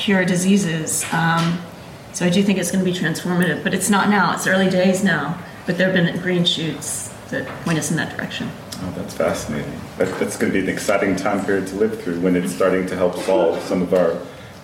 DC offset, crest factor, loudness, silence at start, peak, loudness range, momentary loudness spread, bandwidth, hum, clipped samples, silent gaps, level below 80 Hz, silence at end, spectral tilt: under 0.1%; 14 dB; -20 LUFS; 0 s; -6 dBFS; 5 LU; 11 LU; 16.5 kHz; none; under 0.1%; none; -50 dBFS; 0 s; -4.5 dB/octave